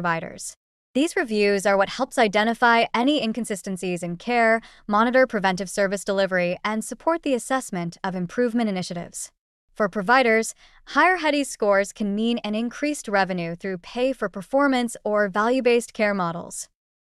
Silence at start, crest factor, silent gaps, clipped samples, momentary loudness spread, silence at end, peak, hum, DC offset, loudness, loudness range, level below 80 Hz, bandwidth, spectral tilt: 0 s; 16 dB; 0.57-0.94 s, 9.39-9.68 s; under 0.1%; 11 LU; 0.35 s; -6 dBFS; none; under 0.1%; -23 LUFS; 3 LU; -58 dBFS; 13 kHz; -4.5 dB/octave